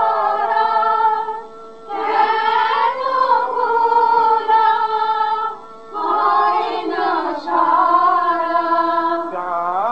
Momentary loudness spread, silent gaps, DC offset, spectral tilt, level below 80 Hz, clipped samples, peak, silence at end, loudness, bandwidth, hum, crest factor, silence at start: 9 LU; none; 0.7%; -4.5 dB/octave; -68 dBFS; under 0.1%; -4 dBFS; 0 s; -17 LUFS; 7.8 kHz; none; 14 dB; 0 s